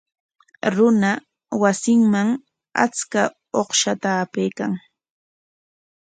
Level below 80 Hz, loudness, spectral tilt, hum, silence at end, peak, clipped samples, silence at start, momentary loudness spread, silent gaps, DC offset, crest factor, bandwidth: -68 dBFS; -20 LUFS; -4 dB/octave; none; 1.35 s; -2 dBFS; under 0.1%; 0.65 s; 11 LU; none; under 0.1%; 20 dB; 9.4 kHz